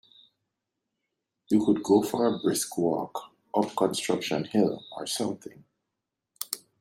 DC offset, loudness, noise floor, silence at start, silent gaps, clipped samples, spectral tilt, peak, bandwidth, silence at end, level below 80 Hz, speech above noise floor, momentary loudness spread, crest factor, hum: under 0.1%; -27 LUFS; -85 dBFS; 1.5 s; none; under 0.1%; -4.5 dB/octave; -8 dBFS; 16 kHz; 0.25 s; -70 dBFS; 58 dB; 13 LU; 20 dB; none